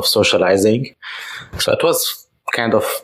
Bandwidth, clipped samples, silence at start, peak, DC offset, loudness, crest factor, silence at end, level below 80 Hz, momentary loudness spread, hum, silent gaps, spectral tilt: 16 kHz; under 0.1%; 0 s; -2 dBFS; under 0.1%; -16 LUFS; 14 dB; 0.05 s; -50 dBFS; 15 LU; none; none; -3.5 dB/octave